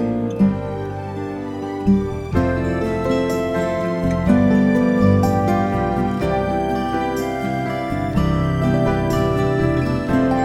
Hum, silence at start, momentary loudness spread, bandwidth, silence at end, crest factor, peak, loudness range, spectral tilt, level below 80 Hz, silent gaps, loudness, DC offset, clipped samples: none; 0 s; 7 LU; 14 kHz; 0 s; 16 dB; -4 dBFS; 3 LU; -8 dB/octave; -34 dBFS; none; -19 LUFS; under 0.1%; under 0.1%